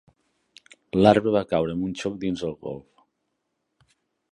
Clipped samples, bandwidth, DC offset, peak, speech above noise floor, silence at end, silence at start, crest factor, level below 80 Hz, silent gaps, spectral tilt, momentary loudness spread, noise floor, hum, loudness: under 0.1%; 11 kHz; under 0.1%; -2 dBFS; 55 dB; 1.5 s; 0.95 s; 24 dB; -54 dBFS; none; -7 dB/octave; 18 LU; -77 dBFS; none; -23 LUFS